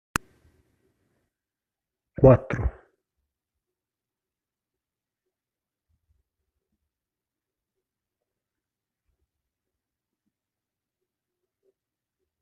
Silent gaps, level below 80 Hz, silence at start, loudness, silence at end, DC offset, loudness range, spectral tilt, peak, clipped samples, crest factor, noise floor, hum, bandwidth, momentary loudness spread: none; -46 dBFS; 2.2 s; -22 LUFS; 9.7 s; under 0.1%; 8 LU; -7.5 dB/octave; -2 dBFS; under 0.1%; 30 dB; -90 dBFS; none; 13 kHz; 15 LU